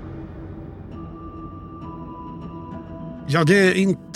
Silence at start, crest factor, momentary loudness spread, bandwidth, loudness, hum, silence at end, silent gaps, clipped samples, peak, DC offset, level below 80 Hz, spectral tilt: 0 s; 22 dB; 21 LU; 13 kHz; -17 LUFS; none; 0 s; none; under 0.1%; -2 dBFS; under 0.1%; -46 dBFS; -6 dB/octave